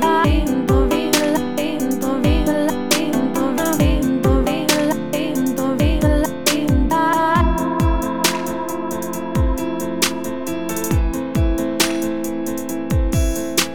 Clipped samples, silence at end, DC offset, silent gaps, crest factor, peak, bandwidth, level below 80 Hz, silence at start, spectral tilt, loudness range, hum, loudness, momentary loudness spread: under 0.1%; 0 s; 2%; none; 16 dB; -2 dBFS; over 20 kHz; -24 dBFS; 0 s; -5 dB/octave; 3 LU; none; -19 LUFS; 7 LU